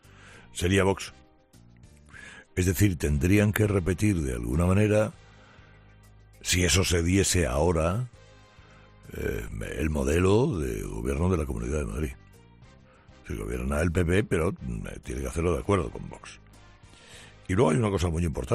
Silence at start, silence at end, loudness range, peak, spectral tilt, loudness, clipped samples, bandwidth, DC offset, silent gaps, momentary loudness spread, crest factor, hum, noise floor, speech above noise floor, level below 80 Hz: 0.25 s; 0 s; 5 LU; -6 dBFS; -5.5 dB/octave; -26 LUFS; under 0.1%; 14.5 kHz; under 0.1%; none; 17 LU; 20 dB; none; -56 dBFS; 30 dB; -40 dBFS